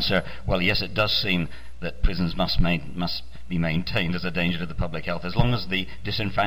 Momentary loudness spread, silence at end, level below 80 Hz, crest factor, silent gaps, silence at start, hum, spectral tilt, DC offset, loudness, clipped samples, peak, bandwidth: 8 LU; 0 s; -34 dBFS; 18 dB; none; 0 s; none; -6.5 dB/octave; 3%; -26 LUFS; under 0.1%; -6 dBFS; 16 kHz